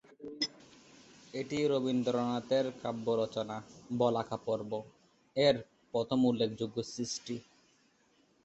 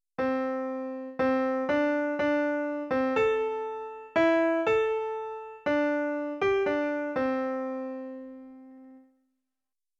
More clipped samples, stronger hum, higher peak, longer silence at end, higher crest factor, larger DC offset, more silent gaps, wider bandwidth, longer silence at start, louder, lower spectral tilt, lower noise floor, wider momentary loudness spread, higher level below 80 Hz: neither; neither; about the same, -12 dBFS vs -12 dBFS; about the same, 1.05 s vs 1 s; first, 22 dB vs 16 dB; neither; neither; about the same, 8.2 kHz vs 7.8 kHz; about the same, 0.2 s vs 0.2 s; second, -34 LUFS vs -28 LUFS; about the same, -5 dB/octave vs -6 dB/octave; second, -70 dBFS vs under -90 dBFS; about the same, 12 LU vs 12 LU; second, -70 dBFS vs -64 dBFS